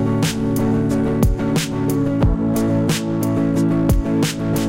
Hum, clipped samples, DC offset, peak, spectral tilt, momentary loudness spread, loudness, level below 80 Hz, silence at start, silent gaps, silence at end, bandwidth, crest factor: none; under 0.1%; 0.7%; -4 dBFS; -6.5 dB/octave; 2 LU; -18 LUFS; -28 dBFS; 0 s; none; 0 s; 17 kHz; 14 dB